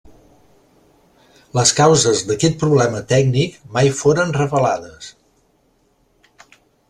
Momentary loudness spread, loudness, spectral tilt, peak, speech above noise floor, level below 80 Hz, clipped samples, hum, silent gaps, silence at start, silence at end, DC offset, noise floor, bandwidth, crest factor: 12 LU; -16 LUFS; -4.5 dB/octave; 0 dBFS; 44 dB; -50 dBFS; under 0.1%; none; none; 1.55 s; 1.8 s; under 0.1%; -60 dBFS; 12.5 kHz; 18 dB